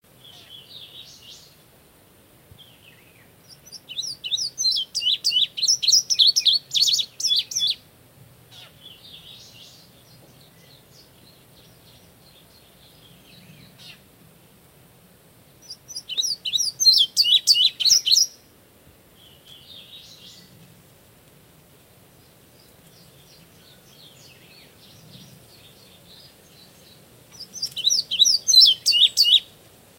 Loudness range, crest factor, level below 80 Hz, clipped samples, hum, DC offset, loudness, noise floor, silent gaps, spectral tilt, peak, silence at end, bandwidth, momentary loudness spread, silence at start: 15 LU; 22 dB; -68 dBFS; under 0.1%; none; under 0.1%; -17 LUFS; -54 dBFS; none; 2 dB/octave; -4 dBFS; 0.55 s; 16 kHz; 28 LU; 0.5 s